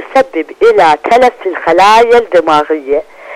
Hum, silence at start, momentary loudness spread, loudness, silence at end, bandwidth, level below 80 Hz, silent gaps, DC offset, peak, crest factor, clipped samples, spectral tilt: none; 0 s; 10 LU; -9 LUFS; 0 s; 14 kHz; -44 dBFS; none; under 0.1%; 0 dBFS; 8 dB; under 0.1%; -3.5 dB/octave